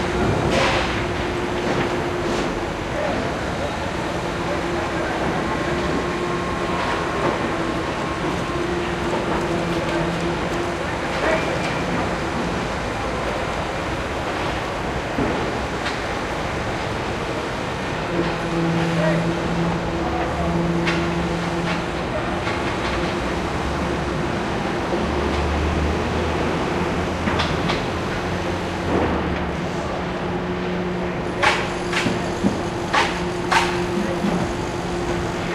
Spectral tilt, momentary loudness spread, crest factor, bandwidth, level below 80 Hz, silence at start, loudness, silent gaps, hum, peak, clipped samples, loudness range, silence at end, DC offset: -5.5 dB/octave; 5 LU; 20 dB; 14 kHz; -34 dBFS; 0 s; -23 LUFS; none; none; -2 dBFS; under 0.1%; 3 LU; 0 s; under 0.1%